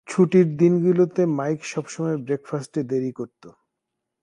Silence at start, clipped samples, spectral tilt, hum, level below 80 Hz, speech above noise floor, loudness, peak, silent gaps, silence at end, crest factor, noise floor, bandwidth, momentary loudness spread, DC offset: 0.1 s; under 0.1%; -7.5 dB/octave; none; -68 dBFS; 60 dB; -22 LUFS; -6 dBFS; none; 0.75 s; 16 dB; -82 dBFS; 10.5 kHz; 12 LU; under 0.1%